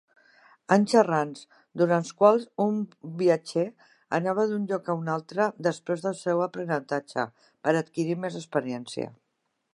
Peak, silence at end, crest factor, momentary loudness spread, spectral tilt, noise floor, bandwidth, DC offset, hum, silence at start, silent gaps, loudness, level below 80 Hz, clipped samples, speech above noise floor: -4 dBFS; 0.65 s; 22 dB; 13 LU; -6 dB/octave; -78 dBFS; 11.5 kHz; under 0.1%; none; 0.7 s; none; -27 LUFS; -78 dBFS; under 0.1%; 52 dB